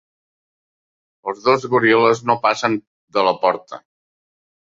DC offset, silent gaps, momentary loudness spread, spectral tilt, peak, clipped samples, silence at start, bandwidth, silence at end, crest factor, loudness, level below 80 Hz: under 0.1%; 2.87-3.08 s; 15 LU; -5 dB/octave; -2 dBFS; under 0.1%; 1.25 s; 7.8 kHz; 1 s; 18 dB; -17 LUFS; -64 dBFS